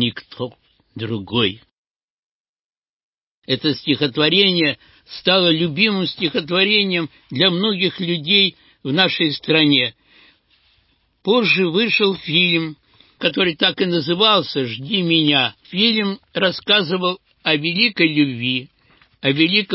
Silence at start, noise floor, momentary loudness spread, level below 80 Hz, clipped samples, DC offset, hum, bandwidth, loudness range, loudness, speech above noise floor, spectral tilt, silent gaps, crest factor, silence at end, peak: 0 s; -62 dBFS; 10 LU; -60 dBFS; under 0.1%; under 0.1%; none; 5.8 kHz; 3 LU; -17 LUFS; 44 dB; -9 dB/octave; 1.73-2.82 s, 2.89-3.13 s, 3.21-3.42 s; 18 dB; 0 s; 0 dBFS